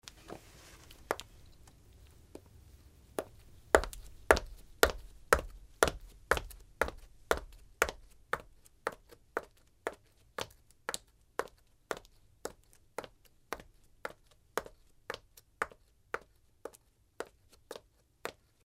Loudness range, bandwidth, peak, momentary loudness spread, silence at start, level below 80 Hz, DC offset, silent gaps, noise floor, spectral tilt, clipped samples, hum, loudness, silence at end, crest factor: 14 LU; 16 kHz; -2 dBFS; 24 LU; 0.05 s; -52 dBFS; under 0.1%; none; -65 dBFS; -3 dB/octave; under 0.1%; none; -37 LUFS; 0.35 s; 38 dB